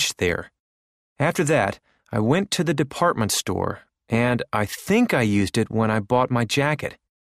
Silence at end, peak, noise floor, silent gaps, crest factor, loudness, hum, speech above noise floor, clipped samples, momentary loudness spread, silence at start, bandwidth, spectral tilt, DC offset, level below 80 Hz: 0.35 s; -6 dBFS; under -90 dBFS; 0.60-1.16 s; 18 dB; -22 LUFS; none; over 68 dB; under 0.1%; 8 LU; 0 s; 15.5 kHz; -5 dB/octave; under 0.1%; -52 dBFS